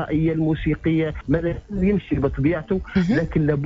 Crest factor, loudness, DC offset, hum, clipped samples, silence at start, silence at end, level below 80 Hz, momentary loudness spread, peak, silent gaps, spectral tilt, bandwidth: 14 dB; -22 LUFS; under 0.1%; none; under 0.1%; 0 s; 0 s; -36 dBFS; 3 LU; -8 dBFS; none; -9.5 dB/octave; 7.4 kHz